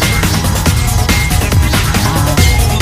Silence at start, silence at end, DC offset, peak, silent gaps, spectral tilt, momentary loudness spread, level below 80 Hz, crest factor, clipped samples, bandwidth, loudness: 0 s; 0 s; 1%; 0 dBFS; none; -4 dB/octave; 2 LU; -16 dBFS; 10 dB; under 0.1%; 16.5 kHz; -12 LUFS